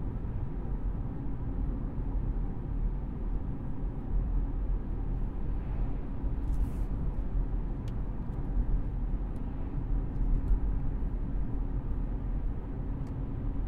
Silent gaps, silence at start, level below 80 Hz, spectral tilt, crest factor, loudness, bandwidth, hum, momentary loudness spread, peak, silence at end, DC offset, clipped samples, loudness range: none; 0 s; -32 dBFS; -10.5 dB/octave; 14 dB; -36 LUFS; 2.9 kHz; none; 4 LU; -16 dBFS; 0 s; under 0.1%; under 0.1%; 1 LU